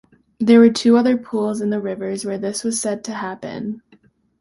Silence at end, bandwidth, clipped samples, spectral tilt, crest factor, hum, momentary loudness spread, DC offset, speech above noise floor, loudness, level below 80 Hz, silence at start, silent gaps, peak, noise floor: 0.6 s; 11.5 kHz; under 0.1%; -5 dB/octave; 16 dB; none; 16 LU; under 0.1%; 37 dB; -18 LUFS; -62 dBFS; 0.4 s; none; -2 dBFS; -55 dBFS